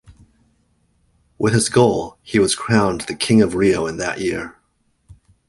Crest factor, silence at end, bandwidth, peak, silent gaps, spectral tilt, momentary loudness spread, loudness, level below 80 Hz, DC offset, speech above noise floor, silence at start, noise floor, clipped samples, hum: 18 dB; 0.95 s; 11.5 kHz; -2 dBFS; none; -5 dB/octave; 9 LU; -18 LUFS; -46 dBFS; under 0.1%; 47 dB; 0.1 s; -65 dBFS; under 0.1%; none